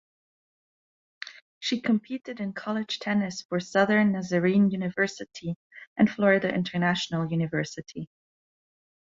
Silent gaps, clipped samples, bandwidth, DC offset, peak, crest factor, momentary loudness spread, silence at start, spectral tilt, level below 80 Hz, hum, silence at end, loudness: 1.42-1.61 s, 3.45-3.49 s, 5.56-5.70 s, 5.87-5.96 s; under 0.1%; 7.6 kHz; under 0.1%; -8 dBFS; 20 dB; 17 LU; 1.25 s; -6 dB/octave; -66 dBFS; none; 1.1 s; -26 LUFS